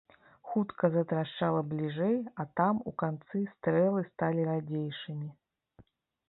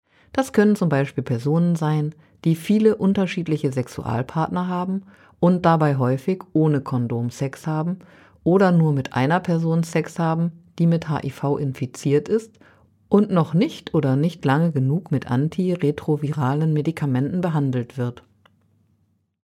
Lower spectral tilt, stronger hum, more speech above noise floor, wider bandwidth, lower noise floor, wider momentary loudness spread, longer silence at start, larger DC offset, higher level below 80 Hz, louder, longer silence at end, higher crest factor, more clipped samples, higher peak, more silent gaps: first, -11 dB/octave vs -8 dB/octave; neither; second, 32 dB vs 45 dB; second, 4.1 kHz vs 13.5 kHz; about the same, -63 dBFS vs -66 dBFS; about the same, 9 LU vs 9 LU; about the same, 0.45 s vs 0.35 s; neither; second, -70 dBFS vs -58 dBFS; second, -32 LUFS vs -22 LUFS; second, 0.95 s vs 1.3 s; about the same, 20 dB vs 18 dB; neither; second, -12 dBFS vs -4 dBFS; neither